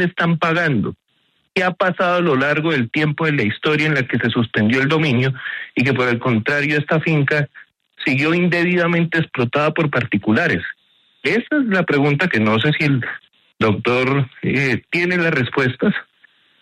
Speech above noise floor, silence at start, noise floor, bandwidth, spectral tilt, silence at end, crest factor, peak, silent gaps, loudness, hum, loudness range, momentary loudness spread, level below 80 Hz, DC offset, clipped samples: 46 dB; 0 s; -64 dBFS; 11 kHz; -7 dB/octave; 0.6 s; 16 dB; -2 dBFS; none; -18 LUFS; none; 1 LU; 5 LU; -56 dBFS; under 0.1%; under 0.1%